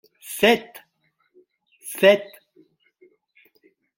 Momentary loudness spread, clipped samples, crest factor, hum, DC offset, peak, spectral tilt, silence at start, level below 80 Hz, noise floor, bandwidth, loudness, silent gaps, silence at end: 25 LU; under 0.1%; 22 dB; none; under 0.1%; -2 dBFS; -3.5 dB/octave; 0.3 s; -68 dBFS; -69 dBFS; 17 kHz; -19 LUFS; none; 1.75 s